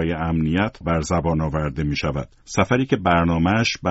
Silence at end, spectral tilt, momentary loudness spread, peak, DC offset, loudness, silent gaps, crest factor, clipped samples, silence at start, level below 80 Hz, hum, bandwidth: 0 s; -5.5 dB/octave; 6 LU; -4 dBFS; under 0.1%; -21 LUFS; none; 16 dB; under 0.1%; 0 s; -36 dBFS; none; 8 kHz